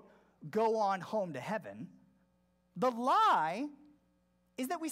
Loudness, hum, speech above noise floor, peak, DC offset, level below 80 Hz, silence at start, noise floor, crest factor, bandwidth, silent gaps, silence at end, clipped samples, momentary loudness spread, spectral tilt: -33 LUFS; none; 41 dB; -20 dBFS; under 0.1%; -82 dBFS; 0.4 s; -74 dBFS; 16 dB; 16 kHz; none; 0 s; under 0.1%; 22 LU; -5 dB/octave